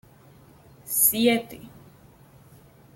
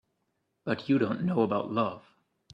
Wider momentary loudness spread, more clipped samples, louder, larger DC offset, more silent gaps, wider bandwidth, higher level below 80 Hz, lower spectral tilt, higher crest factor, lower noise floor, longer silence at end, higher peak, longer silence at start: first, 24 LU vs 10 LU; neither; first, -21 LUFS vs -29 LUFS; neither; neither; first, 17 kHz vs 7.2 kHz; first, -62 dBFS vs -70 dBFS; second, -2.5 dB/octave vs -8.5 dB/octave; about the same, 22 dB vs 18 dB; second, -52 dBFS vs -78 dBFS; first, 1.25 s vs 0.55 s; first, -6 dBFS vs -12 dBFS; first, 0.85 s vs 0.65 s